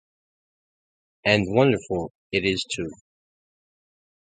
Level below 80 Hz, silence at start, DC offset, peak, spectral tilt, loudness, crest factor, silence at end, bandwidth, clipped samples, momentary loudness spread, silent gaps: -54 dBFS; 1.25 s; under 0.1%; -2 dBFS; -5 dB/octave; -23 LUFS; 24 dB; 1.45 s; 9.4 kHz; under 0.1%; 10 LU; 2.10-2.30 s